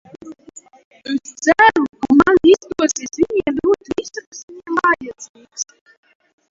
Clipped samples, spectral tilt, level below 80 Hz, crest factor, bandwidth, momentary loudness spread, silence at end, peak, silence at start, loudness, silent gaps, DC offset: under 0.1%; -3.5 dB/octave; -50 dBFS; 18 dB; 7.8 kHz; 22 LU; 0.9 s; 0 dBFS; 0.25 s; -16 LUFS; 0.85-0.91 s, 4.27-4.32 s, 4.43-4.48 s, 5.29-5.34 s; under 0.1%